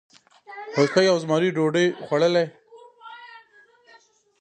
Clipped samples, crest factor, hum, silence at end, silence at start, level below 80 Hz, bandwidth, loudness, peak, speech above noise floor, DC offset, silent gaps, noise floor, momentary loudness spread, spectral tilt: under 0.1%; 18 dB; none; 1 s; 0.5 s; -76 dBFS; 9.2 kHz; -21 LUFS; -6 dBFS; 35 dB; under 0.1%; none; -56 dBFS; 23 LU; -5.5 dB/octave